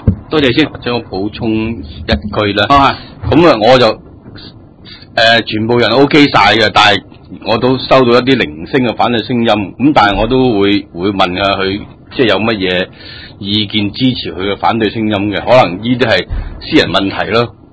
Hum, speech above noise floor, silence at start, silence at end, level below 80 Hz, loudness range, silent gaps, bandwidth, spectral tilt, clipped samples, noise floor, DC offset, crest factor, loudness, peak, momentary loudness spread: none; 24 dB; 0 s; 0.2 s; -32 dBFS; 5 LU; none; 8 kHz; -6 dB/octave; 0.9%; -35 dBFS; under 0.1%; 12 dB; -11 LUFS; 0 dBFS; 10 LU